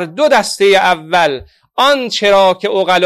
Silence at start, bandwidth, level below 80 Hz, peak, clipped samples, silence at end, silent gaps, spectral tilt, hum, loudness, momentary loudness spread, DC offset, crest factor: 0 s; 15 kHz; -50 dBFS; 0 dBFS; under 0.1%; 0 s; none; -3 dB/octave; none; -11 LUFS; 6 LU; under 0.1%; 12 dB